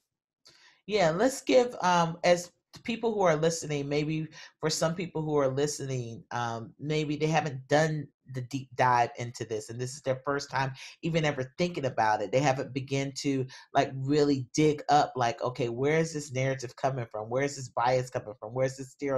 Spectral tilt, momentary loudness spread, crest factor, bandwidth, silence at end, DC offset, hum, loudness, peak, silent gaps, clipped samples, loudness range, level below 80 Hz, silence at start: -5 dB/octave; 11 LU; 20 dB; 13 kHz; 0 s; under 0.1%; none; -29 LUFS; -10 dBFS; 8.14-8.20 s; under 0.1%; 4 LU; -64 dBFS; 0.9 s